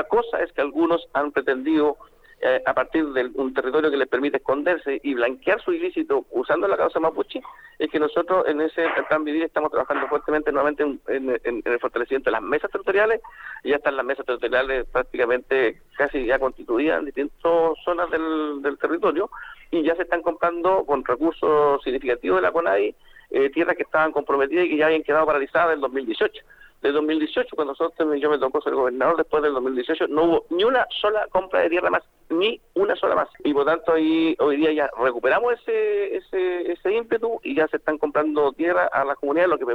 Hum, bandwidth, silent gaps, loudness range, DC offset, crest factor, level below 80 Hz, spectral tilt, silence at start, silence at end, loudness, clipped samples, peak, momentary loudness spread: none; 5.6 kHz; none; 2 LU; under 0.1%; 16 dB; -52 dBFS; -6.5 dB/octave; 0 s; 0 s; -22 LUFS; under 0.1%; -6 dBFS; 5 LU